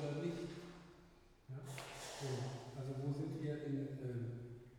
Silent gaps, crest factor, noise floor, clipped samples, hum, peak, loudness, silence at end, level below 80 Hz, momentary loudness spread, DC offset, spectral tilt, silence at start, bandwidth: none; 16 dB; -65 dBFS; under 0.1%; none; -28 dBFS; -46 LUFS; 0 s; -70 dBFS; 14 LU; under 0.1%; -6.5 dB/octave; 0 s; 16.5 kHz